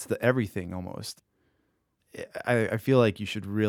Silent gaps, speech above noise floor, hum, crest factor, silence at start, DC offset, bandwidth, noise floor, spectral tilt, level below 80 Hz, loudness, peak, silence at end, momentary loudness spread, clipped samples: none; 46 dB; none; 22 dB; 0 s; under 0.1%; 18 kHz; -74 dBFS; -6.5 dB/octave; -64 dBFS; -27 LUFS; -8 dBFS; 0 s; 18 LU; under 0.1%